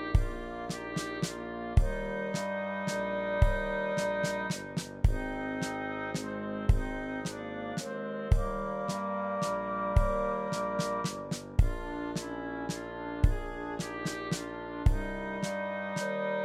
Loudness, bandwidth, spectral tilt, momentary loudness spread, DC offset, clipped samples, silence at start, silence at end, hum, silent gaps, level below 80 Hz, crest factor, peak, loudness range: -33 LUFS; 14.5 kHz; -5.5 dB/octave; 7 LU; under 0.1%; under 0.1%; 0 s; 0 s; none; none; -36 dBFS; 22 dB; -10 dBFS; 2 LU